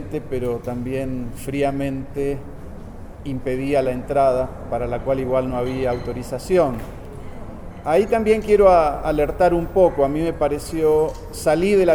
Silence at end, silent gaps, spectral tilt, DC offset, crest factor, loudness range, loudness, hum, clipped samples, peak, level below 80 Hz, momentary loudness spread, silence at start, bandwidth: 0 s; none; -6.5 dB/octave; under 0.1%; 18 dB; 7 LU; -20 LUFS; none; under 0.1%; -2 dBFS; -36 dBFS; 18 LU; 0 s; over 20 kHz